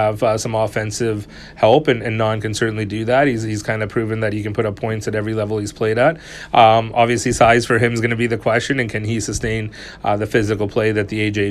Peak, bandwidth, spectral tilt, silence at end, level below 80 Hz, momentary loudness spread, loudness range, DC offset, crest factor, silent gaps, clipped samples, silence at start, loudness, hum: 0 dBFS; 13.5 kHz; -5.5 dB/octave; 0 s; -42 dBFS; 9 LU; 4 LU; under 0.1%; 18 dB; none; under 0.1%; 0 s; -18 LUFS; none